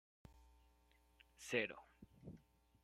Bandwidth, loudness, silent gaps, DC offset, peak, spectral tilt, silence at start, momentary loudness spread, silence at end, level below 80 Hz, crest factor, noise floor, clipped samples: 16 kHz; -44 LUFS; none; under 0.1%; -24 dBFS; -3.5 dB/octave; 0.25 s; 25 LU; 0.45 s; -72 dBFS; 28 dB; -74 dBFS; under 0.1%